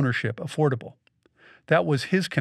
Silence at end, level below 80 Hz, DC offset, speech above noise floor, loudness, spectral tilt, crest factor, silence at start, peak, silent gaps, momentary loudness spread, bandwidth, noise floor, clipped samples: 0 s; -70 dBFS; under 0.1%; 33 dB; -25 LUFS; -6.5 dB/octave; 20 dB; 0 s; -6 dBFS; none; 9 LU; 13 kHz; -57 dBFS; under 0.1%